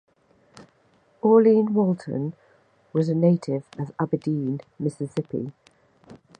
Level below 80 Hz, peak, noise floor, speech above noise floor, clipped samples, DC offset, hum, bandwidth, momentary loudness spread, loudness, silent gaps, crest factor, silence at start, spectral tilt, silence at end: -68 dBFS; -4 dBFS; -62 dBFS; 39 dB; under 0.1%; under 0.1%; none; 9.6 kHz; 14 LU; -24 LUFS; none; 20 dB; 0.6 s; -9.5 dB/octave; 0.25 s